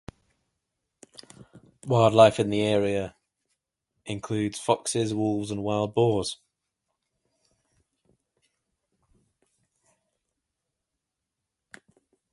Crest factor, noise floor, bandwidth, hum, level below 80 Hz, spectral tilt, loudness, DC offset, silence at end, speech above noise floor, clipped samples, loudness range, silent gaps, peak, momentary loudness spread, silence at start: 24 dB; -85 dBFS; 11.5 kHz; none; -60 dBFS; -5.5 dB/octave; -24 LUFS; under 0.1%; 6 s; 61 dB; under 0.1%; 7 LU; none; -4 dBFS; 18 LU; 1.4 s